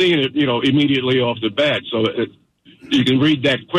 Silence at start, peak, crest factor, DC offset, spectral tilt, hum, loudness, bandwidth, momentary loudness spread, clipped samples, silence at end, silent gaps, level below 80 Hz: 0 s; -6 dBFS; 10 dB; under 0.1%; -6 dB/octave; none; -17 LUFS; 11 kHz; 5 LU; under 0.1%; 0 s; none; -54 dBFS